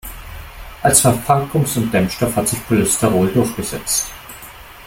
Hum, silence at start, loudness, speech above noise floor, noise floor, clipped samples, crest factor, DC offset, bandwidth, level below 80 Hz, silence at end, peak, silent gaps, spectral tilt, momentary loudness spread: none; 0.05 s; -16 LUFS; 21 dB; -37 dBFS; under 0.1%; 18 dB; under 0.1%; 17 kHz; -38 dBFS; 0 s; 0 dBFS; none; -4.5 dB/octave; 22 LU